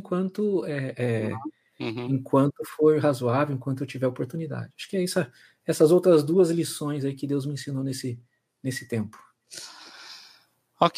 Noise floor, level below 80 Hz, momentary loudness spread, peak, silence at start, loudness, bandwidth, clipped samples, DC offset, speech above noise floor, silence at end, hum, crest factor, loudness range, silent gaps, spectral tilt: -60 dBFS; -76 dBFS; 20 LU; -4 dBFS; 0.05 s; -26 LUFS; 15.5 kHz; under 0.1%; under 0.1%; 35 dB; 0 s; none; 22 dB; 9 LU; none; -6.5 dB/octave